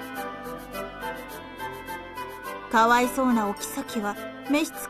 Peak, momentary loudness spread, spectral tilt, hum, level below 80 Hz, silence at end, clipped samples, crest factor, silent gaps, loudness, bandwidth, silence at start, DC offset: -8 dBFS; 16 LU; -3.5 dB/octave; none; -54 dBFS; 0 s; under 0.1%; 20 dB; none; -27 LUFS; 14 kHz; 0 s; under 0.1%